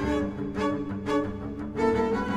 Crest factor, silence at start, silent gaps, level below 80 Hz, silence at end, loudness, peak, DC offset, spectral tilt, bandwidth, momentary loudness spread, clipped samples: 16 dB; 0 s; none; -44 dBFS; 0 s; -29 LUFS; -12 dBFS; under 0.1%; -7 dB/octave; 11 kHz; 8 LU; under 0.1%